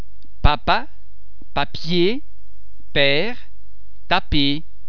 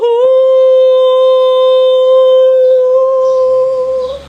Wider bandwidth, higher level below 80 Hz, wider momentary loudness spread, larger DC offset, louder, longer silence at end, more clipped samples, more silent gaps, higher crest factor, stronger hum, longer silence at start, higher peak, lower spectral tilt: second, 5.4 kHz vs 6 kHz; first, -30 dBFS vs -50 dBFS; first, 10 LU vs 4 LU; first, 10% vs under 0.1%; second, -20 LUFS vs -8 LUFS; about the same, 0.05 s vs 0.05 s; neither; neither; first, 22 dB vs 6 dB; neither; about the same, 0 s vs 0 s; about the same, 0 dBFS vs -2 dBFS; first, -6.5 dB/octave vs -3 dB/octave